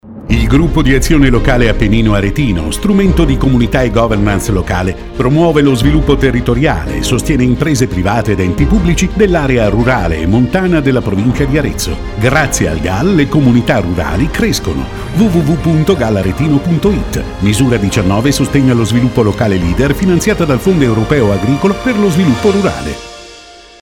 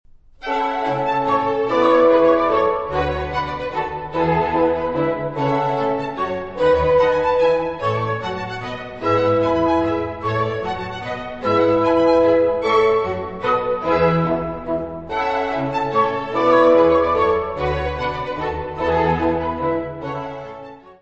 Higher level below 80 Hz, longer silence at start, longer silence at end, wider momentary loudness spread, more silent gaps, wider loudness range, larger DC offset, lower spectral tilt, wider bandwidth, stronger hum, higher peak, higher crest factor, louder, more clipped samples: first, -20 dBFS vs -40 dBFS; second, 0.05 s vs 0.4 s; first, 0.3 s vs 0.1 s; second, 5 LU vs 11 LU; neither; about the same, 1 LU vs 3 LU; neither; second, -6 dB/octave vs -7.5 dB/octave; first, 17.5 kHz vs 7.6 kHz; neither; about the same, 0 dBFS vs -2 dBFS; second, 10 dB vs 16 dB; first, -11 LUFS vs -19 LUFS; neither